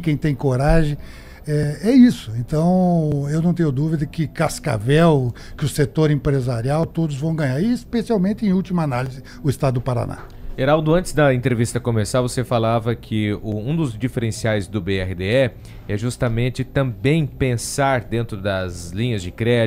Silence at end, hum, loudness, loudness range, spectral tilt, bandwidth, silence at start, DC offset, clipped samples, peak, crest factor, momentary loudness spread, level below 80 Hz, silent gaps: 0 s; none; -20 LUFS; 4 LU; -6.5 dB/octave; 15.5 kHz; 0 s; under 0.1%; under 0.1%; -2 dBFS; 16 dB; 9 LU; -34 dBFS; none